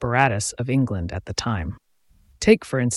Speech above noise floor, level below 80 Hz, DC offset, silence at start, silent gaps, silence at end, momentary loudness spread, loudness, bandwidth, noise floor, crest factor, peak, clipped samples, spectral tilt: 37 dB; -42 dBFS; under 0.1%; 0 s; none; 0 s; 10 LU; -22 LUFS; 12 kHz; -58 dBFS; 20 dB; -2 dBFS; under 0.1%; -5 dB/octave